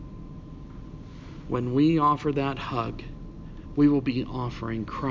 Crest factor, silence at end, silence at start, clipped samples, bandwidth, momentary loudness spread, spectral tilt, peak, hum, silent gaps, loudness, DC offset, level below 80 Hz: 16 dB; 0 s; 0 s; under 0.1%; 7.4 kHz; 21 LU; -8.5 dB/octave; -10 dBFS; none; none; -26 LUFS; under 0.1%; -44 dBFS